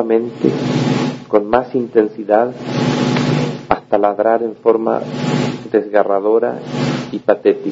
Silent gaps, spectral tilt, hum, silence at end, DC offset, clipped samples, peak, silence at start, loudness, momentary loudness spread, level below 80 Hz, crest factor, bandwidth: none; -7 dB/octave; none; 0 s; under 0.1%; under 0.1%; 0 dBFS; 0 s; -16 LUFS; 5 LU; -52 dBFS; 16 dB; 7.8 kHz